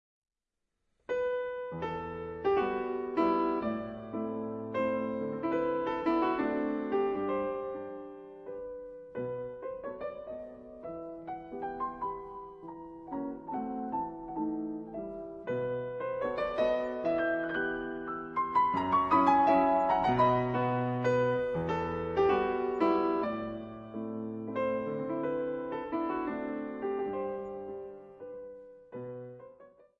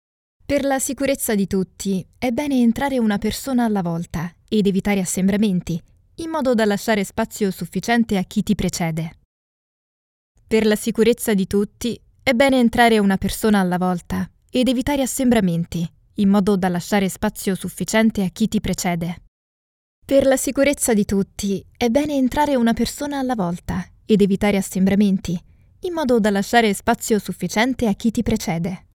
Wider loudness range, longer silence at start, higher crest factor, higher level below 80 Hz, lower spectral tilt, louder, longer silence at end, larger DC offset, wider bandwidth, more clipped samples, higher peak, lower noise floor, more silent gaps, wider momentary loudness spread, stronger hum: first, 13 LU vs 4 LU; first, 1.1 s vs 0.5 s; about the same, 20 dB vs 18 dB; second, -62 dBFS vs -42 dBFS; first, -8 dB/octave vs -5 dB/octave; second, -32 LUFS vs -20 LUFS; first, 0.3 s vs 0.15 s; neither; second, 7.4 kHz vs 17.5 kHz; neither; second, -12 dBFS vs -2 dBFS; second, -86 dBFS vs under -90 dBFS; second, none vs 9.25-10.35 s, 19.28-20.02 s; first, 16 LU vs 9 LU; neither